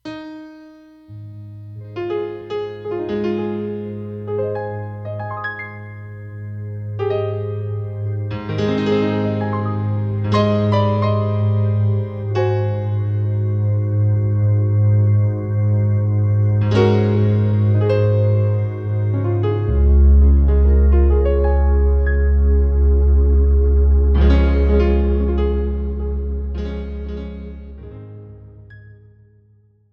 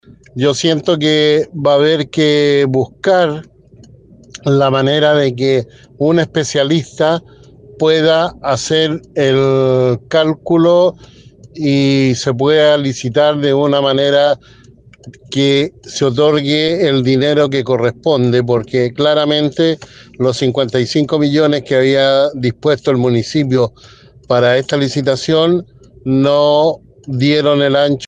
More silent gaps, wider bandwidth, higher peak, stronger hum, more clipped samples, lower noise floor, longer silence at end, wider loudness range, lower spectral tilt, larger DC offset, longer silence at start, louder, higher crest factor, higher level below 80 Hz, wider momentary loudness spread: neither; second, 5.8 kHz vs 9.8 kHz; about the same, -2 dBFS vs 0 dBFS; neither; neither; first, -54 dBFS vs -43 dBFS; first, 1.1 s vs 0 s; first, 11 LU vs 2 LU; first, -9.5 dB/octave vs -5.5 dB/octave; neither; second, 0.05 s vs 0.35 s; second, -18 LUFS vs -13 LUFS; about the same, 14 dB vs 12 dB; first, -20 dBFS vs -50 dBFS; first, 17 LU vs 6 LU